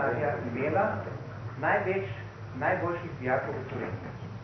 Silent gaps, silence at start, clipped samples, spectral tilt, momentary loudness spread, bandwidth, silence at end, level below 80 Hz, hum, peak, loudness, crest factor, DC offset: none; 0 s; under 0.1%; -8.5 dB/octave; 12 LU; 6.4 kHz; 0 s; -58 dBFS; none; -14 dBFS; -31 LUFS; 18 dB; under 0.1%